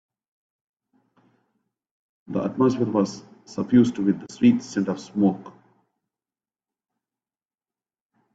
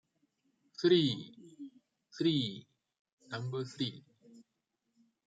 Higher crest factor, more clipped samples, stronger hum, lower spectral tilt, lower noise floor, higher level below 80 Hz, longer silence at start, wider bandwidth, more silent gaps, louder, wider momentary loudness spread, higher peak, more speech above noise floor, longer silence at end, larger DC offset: about the same, 20 dB vs 20 dB; neither; neither; about the same, -7 dB/octave vs -6.5 dB/octave; first, under -90 dBFS vs -84 dBFS; first, -64 dBFS vs -78 dBFS; first, 2.3 s vs 0.8 s; about the same, 8 kHz vs 7.8 kHz; second, none vs 2.99-3.05 s, 3.13-3.18 s; first, -23 LUFS vs -34 LUFS; second, 13 LU vs 24 LU; first, -6 dBFS vs -16 dBFS; first, over 68 dB vs 52 dB; first, 2.85 s vs 0.85 s; neither